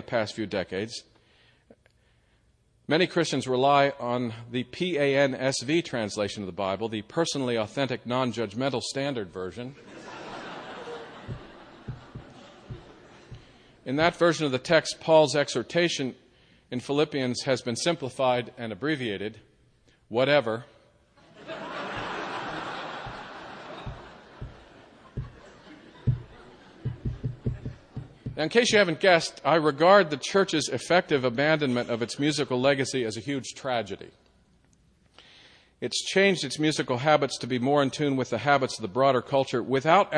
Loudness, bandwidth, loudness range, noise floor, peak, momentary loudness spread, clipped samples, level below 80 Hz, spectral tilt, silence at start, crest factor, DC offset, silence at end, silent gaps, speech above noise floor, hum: -26 LUFS; 10 kHz; 15 LU; -65 dBFS; -6 dBFS; 19 LU; under 0.1%; -54 dBFS; -4.5 dB/octave; 0 s; 22 dB; under 0.1%; 0 s; none; 40 dB; none